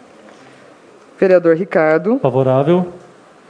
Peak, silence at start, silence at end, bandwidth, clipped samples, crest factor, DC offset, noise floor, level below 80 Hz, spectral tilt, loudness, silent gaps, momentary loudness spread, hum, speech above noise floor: 0 dBFS; 1.2 s; 0.5 s; 9.6 kHz; under 0.1%; 16 dB; under 0.1%; -43 dBFS; -64 dBFS; -9 dB/octave; -14 LUFS; none; 5 LU; none; 30 dB